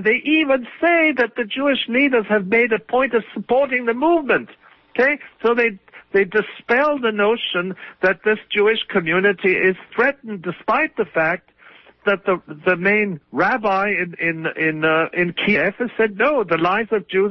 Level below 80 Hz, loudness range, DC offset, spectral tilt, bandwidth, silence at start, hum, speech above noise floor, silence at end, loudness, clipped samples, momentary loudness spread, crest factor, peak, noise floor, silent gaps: -58 dBFS; 2 LU; under 0.1%; -7.5 dB/octave; 6.2 kHz; 0 s; none; 29 dB; 0 s; -19 LUFS; under 0.1%; 5 LU; 14 dB; -4 dBFS; -48 dBFS; none